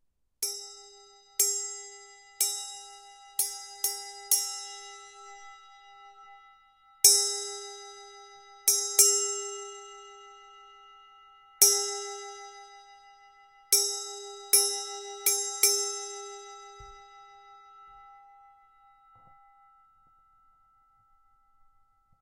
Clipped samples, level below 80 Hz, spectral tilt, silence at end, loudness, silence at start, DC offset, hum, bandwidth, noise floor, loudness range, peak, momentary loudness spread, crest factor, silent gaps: under 0.1%; -72 dBFS; 3 dB/octave; 4.05 s; -25 LUFS; 0.4 s; under 0.1%; none; 16 kHz; -66 dBFS; 8 LU; -2 dBFS; 27 LU; 32 dB; none